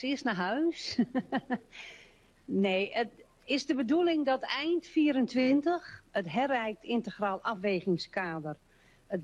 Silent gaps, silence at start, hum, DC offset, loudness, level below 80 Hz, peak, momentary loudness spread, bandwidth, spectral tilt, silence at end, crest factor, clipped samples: none; 0 s; none; under 0.1%; -31 LUFS; -68 dBFS; -18 dBFS; 10 LU; 9.8 kHz; -5.5 dB/octave; 0 s; 14 dB; under 0.1%